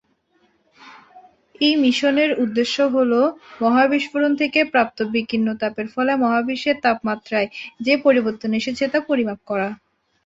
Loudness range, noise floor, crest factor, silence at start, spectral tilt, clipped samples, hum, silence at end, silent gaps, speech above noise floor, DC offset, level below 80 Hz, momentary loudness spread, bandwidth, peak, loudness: 3 LU; -63 dBFS; 18 dB; 0.85 s; -5 dB/octave; under 0.1%; none; 0.5 s; none; 43 dB; under 0.1%; -62 dBFS; 8 LU; 8 kHz; -2 dBFS; -19 LUFS